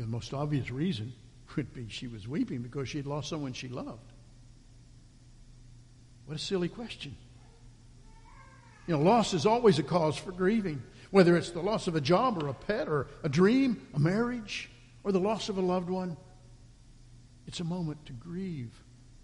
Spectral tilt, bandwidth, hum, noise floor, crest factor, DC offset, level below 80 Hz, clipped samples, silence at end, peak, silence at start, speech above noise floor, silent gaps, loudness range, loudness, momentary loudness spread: -6.5 dB/octave; 11.5 kHz; none; -55 dBFS; 22 dB; under 0.1%; -56 dBFS; under 0.1%; 0.05 s; -10 dBFS; 0 s; 25 dB; none; 13 LU; -30 LUFS; 17 LU